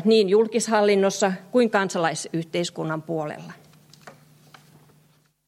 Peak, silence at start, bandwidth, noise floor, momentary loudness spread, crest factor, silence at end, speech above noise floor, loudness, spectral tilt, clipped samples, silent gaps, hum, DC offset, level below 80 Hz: -6 dBFS; 0 s; 14 kHz; -61 dBFS; 11 LU; 18 dB; 1.4 s; 39 dB; -22 LUFS; -4.5 dB/octave; under 0.1%; none; none; under 0.1%; -76 dBFS